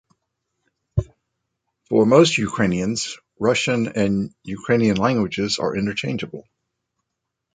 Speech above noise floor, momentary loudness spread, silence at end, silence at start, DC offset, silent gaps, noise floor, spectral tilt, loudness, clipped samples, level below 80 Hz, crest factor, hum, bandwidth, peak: 61 dB; 14 LU; 1.15 s; 0.95 s; under 0.1%; none; -80 dBFS; -5 dB/octave; -20 LUFS; under 0.1%; -46 dBFS; 20 dB; none; 9.4 kHz; -2 dBFS